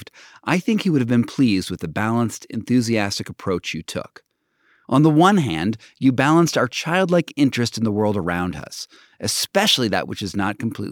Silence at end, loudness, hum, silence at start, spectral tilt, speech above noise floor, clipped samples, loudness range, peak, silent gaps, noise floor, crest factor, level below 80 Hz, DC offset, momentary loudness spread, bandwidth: 0 s; -20 LUFS; none; 0 s; -5 dB/octave; 43 dB; under 0.1%; 4 LU; -2 dBFS; none; -63 dBFS; 18 dB; -54 dBFS; under 0.1%; 12 LU; 18.5 kHz